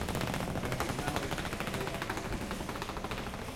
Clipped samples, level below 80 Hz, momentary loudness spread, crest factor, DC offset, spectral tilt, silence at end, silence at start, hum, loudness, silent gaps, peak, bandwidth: under 0.1%; -46 dBFS; 4 LU; 20 dB; under 0.1%; -4.5 dB/octave; 0 s; 0 s; none; -36 LUFS; none; -16 dBFS; 17 kHz